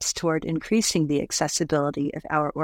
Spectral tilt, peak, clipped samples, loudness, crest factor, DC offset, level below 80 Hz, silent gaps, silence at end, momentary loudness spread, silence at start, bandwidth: -4 dB/octave; -6 dBFS; under 0.1%; -24 LUFS; 18 dB; under 0.1%; -52 dBFS; none; 0 s; 4 LU; 0 s; 17.5 kHz